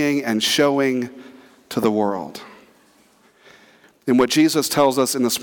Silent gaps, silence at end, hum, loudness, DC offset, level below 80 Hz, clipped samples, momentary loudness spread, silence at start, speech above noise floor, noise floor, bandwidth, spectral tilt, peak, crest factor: none; 0 s; none; -19 LUFS; under 0.1%; -64 dBFS; under 0.1%; 14 LU; 0 s; 37 dB; -55 dBFS; 19 kHz; -3.5 dB/octave; -6 dBFS; 14 dB